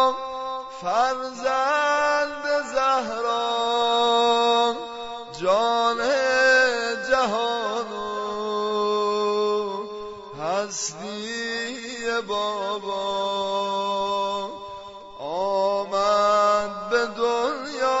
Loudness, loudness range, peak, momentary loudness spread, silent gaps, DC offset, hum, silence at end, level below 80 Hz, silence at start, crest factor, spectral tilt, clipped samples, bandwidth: -23 LUFS; 6 LU; -6 dBFS; 12 LU; none; under 0.1%; none; 0 s; -60 dBFS; 0 s; 16 dB; -2 dB/octave; under 0.1%; 8 kHz